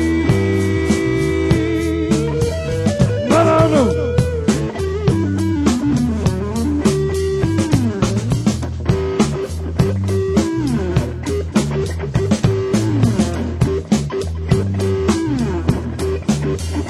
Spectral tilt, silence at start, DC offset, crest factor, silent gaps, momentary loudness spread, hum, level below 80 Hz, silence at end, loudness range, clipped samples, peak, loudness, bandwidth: -6.5 dB/octave; 0 s; under 0.1%; 16 dB; none; 4 LU; none; -28 dBFS; 0 s; 3 LU; under 0.1%; 0 dBFS; -17 LUFS; 15 kHz